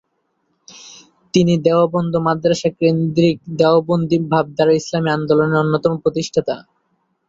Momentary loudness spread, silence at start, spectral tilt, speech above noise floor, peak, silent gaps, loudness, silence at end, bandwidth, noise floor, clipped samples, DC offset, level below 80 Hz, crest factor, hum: 6 LU; 0.75 s; -6.5 dB/octave; 52 dB; -2 dBFS; none; -17 LUFS; 0.7 s; 7.8 kHz; -68 dBFS; under 0.1%; under 0.1%; -54 dBFS; 16 dB; none